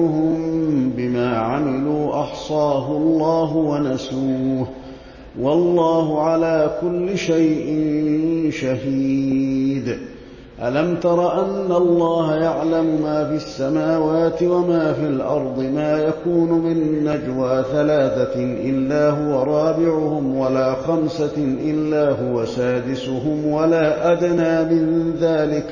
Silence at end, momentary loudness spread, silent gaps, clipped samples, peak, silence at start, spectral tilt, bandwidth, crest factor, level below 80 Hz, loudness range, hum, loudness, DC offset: 0 s; 5 LU; none; under 0.1%; -6 dBFS; 0 s; -7.5 dB/octave; 7.4 kHz; 12 dB; -48 dBFS; 2 LU; none; -19 LUFS; under 0.1%